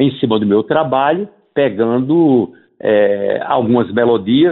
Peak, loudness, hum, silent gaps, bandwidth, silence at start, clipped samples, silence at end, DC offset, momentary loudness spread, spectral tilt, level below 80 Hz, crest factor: -2 dBFS; -14 LUFS; none; none; 4.2 kHz; 0 s; under 0.1%; 0 s; under 0.1%; 5 LU; -11.5 dB/octave; -56 dBFS; 12 dB